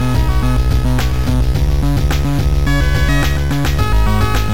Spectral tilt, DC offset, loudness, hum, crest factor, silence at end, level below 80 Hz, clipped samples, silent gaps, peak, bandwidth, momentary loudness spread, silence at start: -6 dB/octave; 9%; -16 LUFS; none; 10 dB; 0 s; -16 dBFS; under 0.1%; none; -4 dBFS; 17 kHz; 2 LU; 0 s